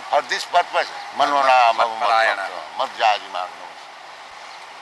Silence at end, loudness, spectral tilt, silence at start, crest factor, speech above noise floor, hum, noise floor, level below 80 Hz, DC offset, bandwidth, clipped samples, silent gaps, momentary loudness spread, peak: 0 s; -19 LUFS; -0.5 dB/octave; 0 s; 16 dB; 20 dB; none; -39 dBFS; -72 dBFS; under 0.1%; 12 kHz; under 0.1%; none; 22 LU; -4 dBFS